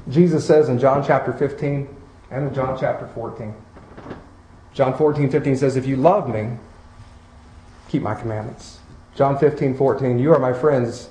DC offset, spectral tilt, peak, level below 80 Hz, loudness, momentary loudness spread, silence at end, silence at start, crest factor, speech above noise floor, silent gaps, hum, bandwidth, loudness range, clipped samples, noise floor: under 0.1%; -8 dB/octave; -2 dBFS; -48 dBFS; -19 LUFS; 19 LU; 0 s; 0 s; 18 dB; 27 dB; none; none; 10 kHz; 7 LU; under 0.1%; -45 dBFS